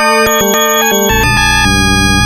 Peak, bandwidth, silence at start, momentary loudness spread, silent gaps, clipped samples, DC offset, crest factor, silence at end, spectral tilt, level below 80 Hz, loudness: 0 dBFS; 17.5 kHz; 0 s; 1 LU; none; 0.1%; under 0.1%; 10 dB; 0 s; -3 dB/octave; -22 dBFS; -9 LUFS